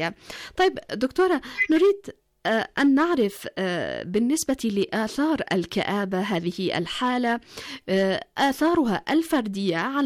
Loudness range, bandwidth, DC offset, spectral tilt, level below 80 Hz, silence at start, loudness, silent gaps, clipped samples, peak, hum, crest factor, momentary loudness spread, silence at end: 2 LU; 17.5 kHz; under 0.1%; -5 dB/octave; -56 dBFS; 0 s; -24 LUFS; none; under 0.1%; -12 dBFS; none; 12 dB; 8 LU; 0 s